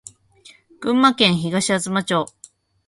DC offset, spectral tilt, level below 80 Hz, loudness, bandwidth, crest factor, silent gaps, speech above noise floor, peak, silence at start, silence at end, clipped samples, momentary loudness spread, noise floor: under 0.1%; -4 dB/octave; -60 dBFS; -18 LUFS; 11.5 kHz; 20 dB; none; 32 dB; -2 dBFS; 0.8 s; 0.6 s; under 0.1%; 10 LU; -50 dBFS